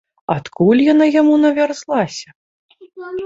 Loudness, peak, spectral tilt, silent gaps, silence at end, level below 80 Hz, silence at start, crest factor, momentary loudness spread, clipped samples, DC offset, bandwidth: -15 LUFS; -2 dBFS; -6.5 dB/octave; 2.35-2.69 s; 0 s; -58 dBFS; 0.3 s; 14 dB; 16 LU; under 0.1%; under 0.1%; 7.8 kHz